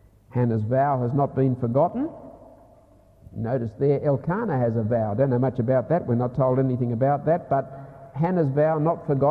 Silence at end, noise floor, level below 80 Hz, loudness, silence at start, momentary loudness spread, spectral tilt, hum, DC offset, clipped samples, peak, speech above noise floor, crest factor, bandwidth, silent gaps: 0 s; -54 dBFS; -52 dBFS; -23 LUFS; 0.35 s; 9 LU; -11.5 dB/octave; none; under 0.1%; under 0.1%; -10 dBFS; 32 dB; 14 dB; 4.6 kHz; none